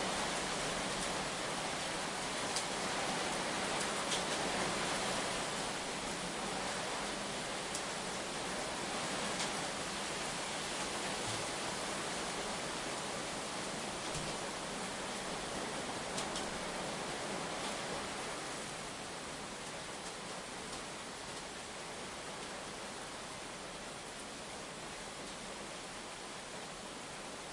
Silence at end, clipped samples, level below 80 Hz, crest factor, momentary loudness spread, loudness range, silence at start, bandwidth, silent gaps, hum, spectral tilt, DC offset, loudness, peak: 0 s; under 0.1%; -62 dBFS; 20 dB; 9 LU; 8 LU; 0 s; 11.5 kHz; none; none; -2 dB/octave; under 0.1%; -39 LUFS; -20 dBFS